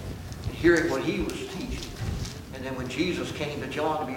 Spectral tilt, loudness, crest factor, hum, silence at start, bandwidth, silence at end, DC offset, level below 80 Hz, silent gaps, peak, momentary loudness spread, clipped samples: -5.5 dB/octave; -29 LUFS; 22 dB; none; 0 s; 17 kHz; 0 s; under 0.1%; -42 dBFS; none; -8 dBFS; 14 LU; under 0.1%